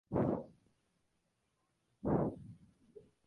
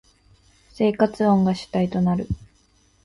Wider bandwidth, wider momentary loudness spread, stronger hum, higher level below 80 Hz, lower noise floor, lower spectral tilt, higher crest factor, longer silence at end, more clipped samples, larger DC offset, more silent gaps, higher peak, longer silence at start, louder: about the same, 10.5 kHz vs 11 kHz; first, 21 LU vs 9 LU; neither; second, -60 dBFS vs -46 dBFS; first, -81 dBFS vs -60 dBFS; first, -11 dB/octave vs -8 dB/octave; about the same, 22 dB vs 18 dB; second, 0.25 s vs 0.6 s; neither; neither; neither; second, -20 dBFS vs -4 dBFS; second, 0.1 s vs 0.8 s; second, -38 LUFS vs -22 LUFS